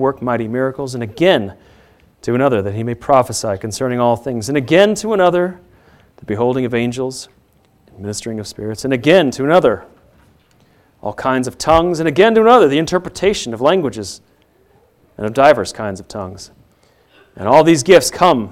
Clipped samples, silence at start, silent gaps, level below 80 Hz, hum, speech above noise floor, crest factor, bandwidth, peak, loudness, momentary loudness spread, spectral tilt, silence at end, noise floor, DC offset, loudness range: under 0.1%; 0 s; none; -46 dBFS; none; 39 dB; 16 dB; 16 kHz; 0 dBFS; -15 LUFS; 16 LU; -5 dB/octave; 0 s; -54 dBFS; under 0.1%; 6 LU